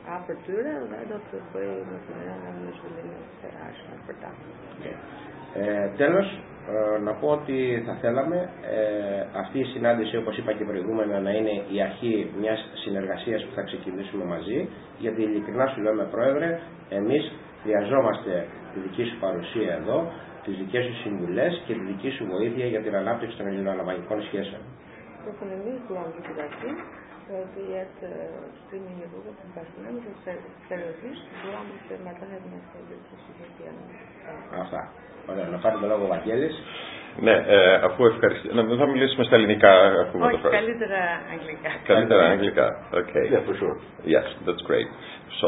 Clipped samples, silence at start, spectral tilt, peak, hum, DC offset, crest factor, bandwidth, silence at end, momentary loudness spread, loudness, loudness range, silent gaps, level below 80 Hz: under 0.1%; 0 s; -10 dB/octave; 0 dBFS; none; under 0.1%; 26 dB; 4 kHz; 0 s; 21 LU; -25 LUFS; 18 LU; none; -60 dBFS